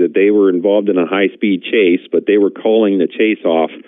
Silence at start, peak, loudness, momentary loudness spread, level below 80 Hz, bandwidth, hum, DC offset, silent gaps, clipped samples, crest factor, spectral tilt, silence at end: 0 s; -4 dBFS; -13 LUFS; 4 LU; -78 dBFS; 3.9 kHz; none; under 0.1%; none; under 0.1%; 10 dB; -10.5 dB/octave; 0.1 s